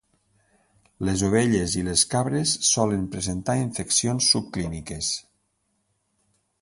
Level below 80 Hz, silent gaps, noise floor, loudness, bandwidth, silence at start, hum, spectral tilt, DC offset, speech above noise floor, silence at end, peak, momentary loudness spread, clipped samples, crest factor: -46 dBFS; none; -73 dBFS; -23 LUFS; 11.5 kHz; 1 s; none; -3.5 dB/octave; under 0.1%; 49 dB; 1.4 s; -6 dBFS; 10 LU; under 0.1%; 20 dB